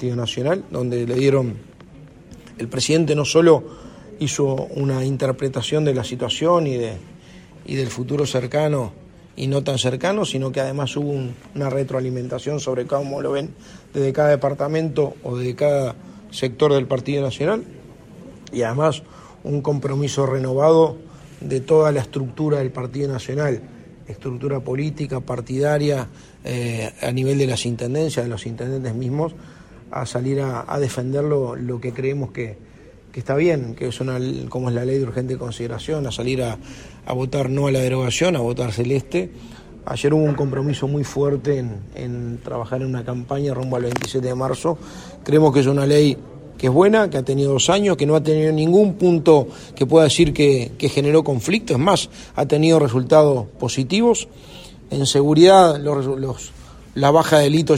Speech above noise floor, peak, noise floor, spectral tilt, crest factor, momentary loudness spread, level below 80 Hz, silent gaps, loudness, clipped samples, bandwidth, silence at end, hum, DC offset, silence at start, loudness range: 26 dB; 0 dBFS; -45 dBFS; -6 dB/octave; 18 dB; 14 LU; -48 dBFS; none; -20 LUFS; under 0.1%; 15 kHz; 0 s; none; under 0.1%; 0 s; 8 LU